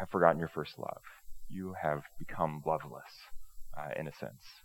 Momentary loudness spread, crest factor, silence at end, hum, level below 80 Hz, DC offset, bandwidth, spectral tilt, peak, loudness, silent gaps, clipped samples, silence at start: 23 LU; 28 dB; 0.05 s; none; -56 dBFS; under 0.1%; 17.5 kHz; -7 dB/octave; -8 dBFS; -36 LUFS; none; under 0.1%; 0 s